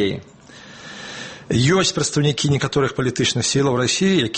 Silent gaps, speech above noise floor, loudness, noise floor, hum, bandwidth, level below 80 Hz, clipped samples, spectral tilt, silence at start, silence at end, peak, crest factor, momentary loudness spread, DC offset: none; 23 dB; -18 LUFS; -42 dBFS; none; 8.8 kHz; -48 dBFS; under 0.1%; -4.5 dB/octave; 0 s; 0 s; -4 dBFS; 16 dB; 16 LU; under 0.1%